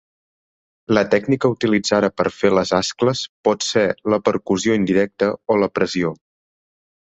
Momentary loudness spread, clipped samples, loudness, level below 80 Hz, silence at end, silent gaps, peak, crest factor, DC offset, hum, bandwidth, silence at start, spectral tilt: 4 LU; under 0.1%; -19 LUFS; -54 dBFS; 1.05 s; 3.29-3.44 s; -2 dBFS; 18 dB; under 0.1%; none; 8.2 kHz; 0.9 s; -5 dB/octave